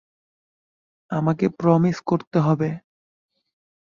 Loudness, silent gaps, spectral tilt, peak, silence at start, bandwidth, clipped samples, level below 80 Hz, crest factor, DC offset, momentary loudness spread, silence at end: -22 LUFS; 2.27-2.31 s; -9 dB/octave; -4 dBFS; 1.1 s; 7.2 kHz; under 0.1%; -62 dBFS; 20 dB; under 0.1%; 9 LU; 1.2 s